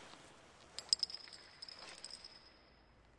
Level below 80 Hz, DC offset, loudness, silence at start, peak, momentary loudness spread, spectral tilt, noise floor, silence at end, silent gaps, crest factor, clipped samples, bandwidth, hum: -74 dBFS; under 0.1%; -42 LUFS; 0 s; -12 dBFS; 25 LU; 0.5 dB/octave; -66 dBFS; 0 s; none; 36 dB; under 0.1%; 11.5 kHz; none